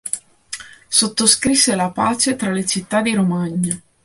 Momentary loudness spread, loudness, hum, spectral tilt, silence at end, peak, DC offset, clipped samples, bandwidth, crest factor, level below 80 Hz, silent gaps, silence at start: 16 LU; -17 LUFS; none; -3 dB/octave; 0.25 s; 0 dBFS; under 0.1%; under 0.1%; 12 kHz; 18 dB; -52 dBFS; none; 0.05 s